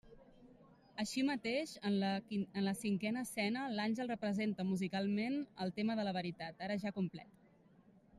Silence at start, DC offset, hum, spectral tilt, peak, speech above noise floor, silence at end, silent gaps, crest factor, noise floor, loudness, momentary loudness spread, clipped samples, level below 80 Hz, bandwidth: 0.05 s; under 0.1%; none; -5.5 dB/octave; -24 dBFS; 28 dB; 0 s; none; 14 dB; -67 dBFS; -39 LUFS; 6 LU; under 0.1%; -76 dBFS; 14 kHz